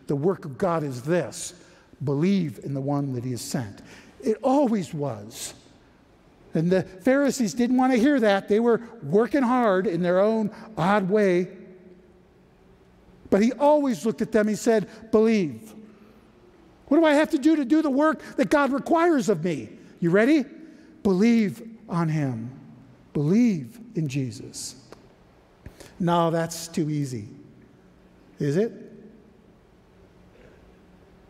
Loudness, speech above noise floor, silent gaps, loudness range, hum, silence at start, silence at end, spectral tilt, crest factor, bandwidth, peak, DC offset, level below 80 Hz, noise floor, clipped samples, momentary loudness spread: -24 LUFS; 33 dB; none; 7 LU; none; 0.1 s; 2.2 s; -6.5 dB/octave; 18 dB; 15.5 kHz; -6 dBFS; under 0.1%; -60 dBFS; -56 dBFS; under 0.1%; 13 LU